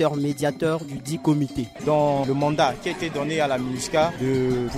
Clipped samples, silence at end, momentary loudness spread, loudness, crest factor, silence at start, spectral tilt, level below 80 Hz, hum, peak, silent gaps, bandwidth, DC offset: under 0.1%; 0 s; 7 LU; -23 LUFS; 16 dB; 0 s; -6 dB/octave; -50 dBFS; none; -8 dBFS; none; 15.5 kHz; under 0.1%